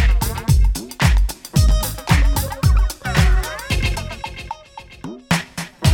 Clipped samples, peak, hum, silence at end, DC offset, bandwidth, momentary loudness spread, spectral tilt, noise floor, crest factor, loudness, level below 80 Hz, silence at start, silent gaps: under 0.1%; 0 dBFS; none; 0 s; under 0.1%; 17.5 kHz; 16 LU; -4.5 dB/octave; -40 dBFS; 16 dB; -19 LUFS; -20 dBFS; 0 s; none